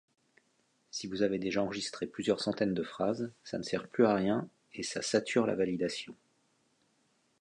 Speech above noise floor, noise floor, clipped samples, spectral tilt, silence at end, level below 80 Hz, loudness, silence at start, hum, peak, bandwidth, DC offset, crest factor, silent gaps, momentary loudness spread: 41 dB; -74 dBFS; under 0.1%; -5 dB/octave; 1.25 s; -68 dBFS; -33 LUFS; 0.95 s; none; -12 dBFS; 11 kHz; under 0.1%; 22 dB; none; 12 LU